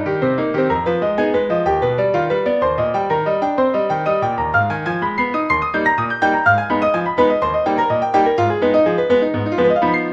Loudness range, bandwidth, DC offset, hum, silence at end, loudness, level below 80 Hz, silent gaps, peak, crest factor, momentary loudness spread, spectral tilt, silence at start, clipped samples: 2 LU; 7.4 kHz; under 0.1%; none; 0 s; -17 LUFS; -44 dBFS; none; -2 dBFS; 14 dB; 3 LU; -7.5 dB/octave; 0 s; under 0.1%